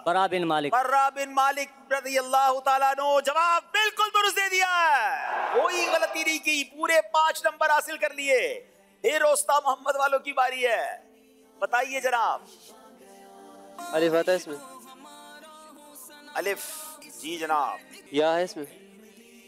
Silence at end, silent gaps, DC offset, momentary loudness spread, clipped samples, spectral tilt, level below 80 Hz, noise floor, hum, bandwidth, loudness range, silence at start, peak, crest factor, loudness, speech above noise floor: 0.8 s; none; under 0.1%; 16 LU; under 0.1%; -1.5 dB/octave; -82 dBFS; -57 dBFS; none; 16 kHz; 8 LU; 0.05 s; -12 dBFS; 14 dB; -25 LUFS; 32 dB